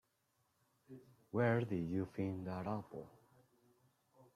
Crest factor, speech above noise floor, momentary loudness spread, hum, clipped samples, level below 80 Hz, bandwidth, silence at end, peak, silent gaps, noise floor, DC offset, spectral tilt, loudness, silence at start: 20 dB; 42 dB; 24 LU; none; under 0.1%; -76 dBFS; 13.5 kHz; 0.1 s; -22 dBFS; none; -81 dBFS; under 0.1%; -9 dB/octave; -40 LUFS; 0.9 s